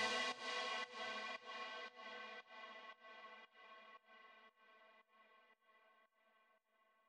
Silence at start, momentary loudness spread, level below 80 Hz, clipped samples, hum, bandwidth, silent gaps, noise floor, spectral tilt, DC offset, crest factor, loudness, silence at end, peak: 0 s; 24 LU; under -90 dBFS; under 0.1%; none; 12 kHz; none; -79 dBFS; -0.5 dB/octave; under 0.1%; 24 dB; -47 LUFS; 1.05 s; -28 dBFS